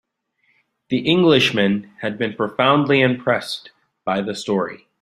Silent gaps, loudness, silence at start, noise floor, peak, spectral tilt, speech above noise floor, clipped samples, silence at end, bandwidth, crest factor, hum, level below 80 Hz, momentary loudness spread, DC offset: none; -19 LUFS; 0.9 s; -66 dBFS; -2 dBFS; -5.5 dB/octave; 48 dB; under 0.1%; 0.25 s; 14.5 kHz; 18 dB; none; -60 dBFS; 14 LU; under 0.1%